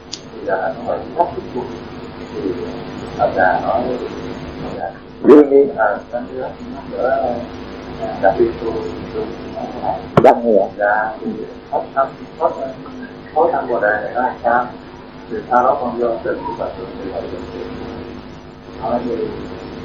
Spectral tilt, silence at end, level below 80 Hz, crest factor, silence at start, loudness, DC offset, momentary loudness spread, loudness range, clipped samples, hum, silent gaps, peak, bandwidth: -7 dB/octave; 0 s; -44 dBFS; 18 dB; 0 s; -18 LUFS; 0.2%; 16 LU; 7 LU; 0.2%; none; none; 0 dBFS; 7.6 kHz